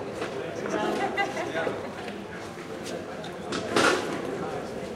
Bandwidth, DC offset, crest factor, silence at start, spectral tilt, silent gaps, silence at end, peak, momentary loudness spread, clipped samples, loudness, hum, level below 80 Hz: 16 kHz; under 0.1%; 22 dB; 0 s; -4 dB/octave; none; 0 s; -8 dBFS; 13 LU; under 0.1%; -30 LUFS; none; -60 dBFS